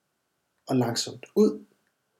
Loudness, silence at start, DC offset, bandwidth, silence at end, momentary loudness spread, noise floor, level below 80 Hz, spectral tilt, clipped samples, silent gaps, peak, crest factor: -26 LUFS; 0.7 s; under 0.1%; 16 kHz; 0.6 s; 7 LU; -77 dBFS; -82 dBFS; -5 dB/octave; under 0.1%; none; -10 dBFS; 18 dB